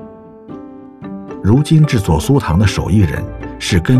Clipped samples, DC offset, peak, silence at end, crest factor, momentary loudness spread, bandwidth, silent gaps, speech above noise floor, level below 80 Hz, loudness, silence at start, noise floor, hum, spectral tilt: under 0.1%; under 0.1%; 0 dBFS; 0 s; 14 dB; 21 LU; 14 kHz; none; 23 dB; -30 dBFS; -14 LUFS; 0 s; -35 dBFS; none; -6.5 dB/octave